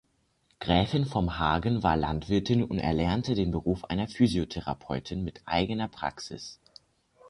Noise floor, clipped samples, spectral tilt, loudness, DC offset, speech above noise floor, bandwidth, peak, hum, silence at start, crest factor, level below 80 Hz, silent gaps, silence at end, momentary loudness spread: -70 dBFS; under 0.1%; -6.5 dB/octave; -29 LUFS; under 0.1%; 42 dB; 11.5 kHz; -8 dBFS; none; 0.6 s; 20 dB; -44 dBFS; none; 0 s; 9 LU